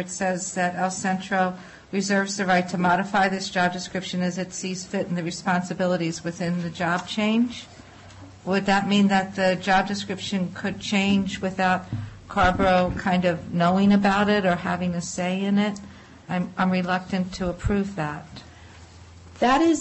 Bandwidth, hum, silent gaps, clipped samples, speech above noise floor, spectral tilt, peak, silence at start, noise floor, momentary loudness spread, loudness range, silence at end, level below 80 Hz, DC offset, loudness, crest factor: 8.6 kHz; none; none; under 0.1%; 22 dB; -5 dB/octave; -10 dBFS; 0 s; -46 dBFS; 10 LU; 5 LU; 0 s; -46 dBFS; under 0.1%; -24 LUFS; 14 dB